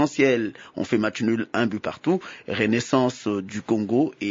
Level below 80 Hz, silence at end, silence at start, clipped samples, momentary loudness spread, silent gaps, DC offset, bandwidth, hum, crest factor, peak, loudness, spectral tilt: -64 dBFS; 0 s; 0 s; under 0.1%; 7 LU; none; under 0.1%; 7.8 kHz; none; 16 dB; -6 dBFS; -24 LUFS; -5.5 dB/octave